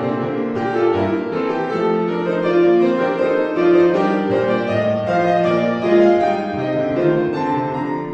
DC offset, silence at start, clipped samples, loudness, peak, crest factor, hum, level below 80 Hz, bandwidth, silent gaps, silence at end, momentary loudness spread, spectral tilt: under 0.1%; 0 s; under 0.1%; -17 LUFS; -2 dBFS; 14 dB; none; -58 dBFS; 7 kHz; none; 0 s; 7 LU; -8 dB/octave